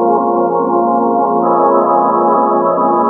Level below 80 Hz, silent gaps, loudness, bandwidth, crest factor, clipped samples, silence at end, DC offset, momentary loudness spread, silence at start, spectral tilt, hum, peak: -64 dBFS; none; -12 LUFS; 2.5 kHz; 10 dB; under 0.1%; 0 s; under 0.1%; 2 LU; 0 s; -12 dB/octave; none; 0 dBFS